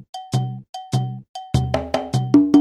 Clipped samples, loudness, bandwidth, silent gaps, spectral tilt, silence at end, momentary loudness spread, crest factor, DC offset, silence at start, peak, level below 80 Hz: under 0.1%; -21 LUFS; 12 kHz; 0.69-0.73 s, 1.29-1.34 s; -7.5 dB/octave; 0 s; 13 LU; 18 dB; under 0.1%; 0.15 s; -2 dBFS; -40 dBFS